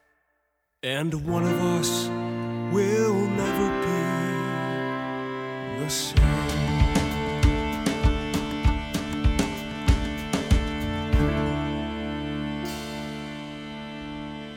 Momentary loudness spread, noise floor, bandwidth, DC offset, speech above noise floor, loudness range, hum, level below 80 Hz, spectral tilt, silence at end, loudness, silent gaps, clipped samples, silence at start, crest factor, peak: 10 LU; -74 dBFS; 17 kHz; under 0.1%; 51 dB; 3 LU; none; -32 dBFS; -5.5 dB/octave; 0 s; -26 LUFS; none; under 0.1%; 0.85 s; 18 dB; -6 dBFS